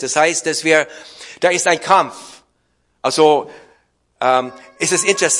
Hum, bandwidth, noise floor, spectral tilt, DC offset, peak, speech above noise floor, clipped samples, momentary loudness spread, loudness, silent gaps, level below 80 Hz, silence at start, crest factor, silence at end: none; 11.5 kHz; -64 dBFS; -2 dB/octave; under 0.1%; 0 dBFS; 48 dB; under 0.1%; 17 LU; -16 LUFS; none; -66 dBFS; 0 s; 18 dB; 0 s